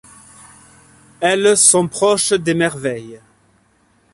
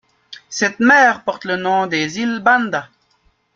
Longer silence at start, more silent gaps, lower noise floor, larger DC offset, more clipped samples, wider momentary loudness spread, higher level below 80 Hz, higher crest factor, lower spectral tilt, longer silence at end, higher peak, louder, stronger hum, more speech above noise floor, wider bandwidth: first, 1.2 s vs 0.3 s; neither; about the same, -57 dBFS vs -60 dBFS; neither; neither; about the same, 14 LU vs 12 LU; about the same, -56 dBFS vs -60 dBFS; about the same, 18 dB vs 18 dB; about the same, -2.5 dB/octave vs -3.5 dB/octave; first, 0.95 s vs 0.7 s; about the same, 0 dBFS vs 0 dBFS; about the same, -14 LUFS vs -16 LUFS; neither; about the same, 42 dB vs 44 dB; first, 12 kHz vs 7.6 kHz